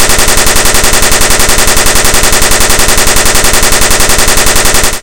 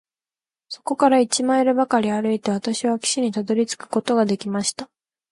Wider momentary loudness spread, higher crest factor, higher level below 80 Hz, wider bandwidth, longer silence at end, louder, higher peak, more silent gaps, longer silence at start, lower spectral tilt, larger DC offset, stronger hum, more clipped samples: second, 0 LU vs 9 LU; second, 6 dB vs 18 dB; first, -12 dBFS vs -68 dBFS; first, over 20 kHz vs 11.5 kHz; second, 0 s vs 0.45 s; first, -5 LUFS vs -21 LUFS; first, 0 dBFS vs -4 dBFS; neither; second, 0 s vs 0.7 s; second, -1.5 dB/octave vs -4 dB/octave; first, 20% vs under 0.1%; neither; first, 10% vs under 0.1%